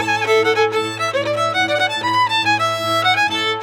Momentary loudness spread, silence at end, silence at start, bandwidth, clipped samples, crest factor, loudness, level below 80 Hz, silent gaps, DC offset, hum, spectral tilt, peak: 4 LU; 0 s; 0 s; 17 kHz; under 0.1%; 14 dB; -16 LUFS; -64 dBFS; none; under 0.1%; none; -3 dB/octave; -4 dBFS